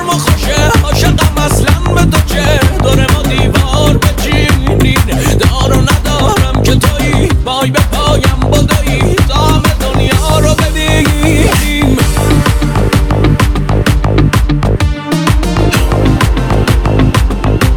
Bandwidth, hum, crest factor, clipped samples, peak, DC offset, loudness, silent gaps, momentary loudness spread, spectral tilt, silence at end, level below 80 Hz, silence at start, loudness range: 19.5 kHz; none; 8 dB; under 0.1%; 0 dBFS; under 0.1%; -10 LUFS; none; 2 LU; -5 dB/octave; 0 s; -14 dBFS; 0 s; 1 LU